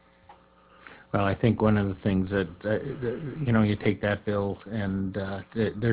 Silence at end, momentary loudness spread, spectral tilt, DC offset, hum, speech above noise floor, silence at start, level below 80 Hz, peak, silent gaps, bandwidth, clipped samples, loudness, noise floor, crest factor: 0 s; 8 LU; -11.5 dB/octave; under 0.1%; none; 30 dB; 0.3 s; -48 dBFS; -8 dBFS; none; 4 kHz; under 0.1%; -27 LUFS; -56 dBFS; 20 dB